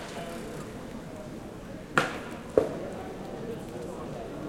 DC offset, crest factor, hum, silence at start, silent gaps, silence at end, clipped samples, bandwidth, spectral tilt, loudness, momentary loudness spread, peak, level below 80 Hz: under 0.1%; 30 dB; none; 0 s; none; 0 s; under 0.1%; 16.5 kHz; -5 dB/octave; -34 LUFS; 13 LU; -4 dBFS; -52 dBFS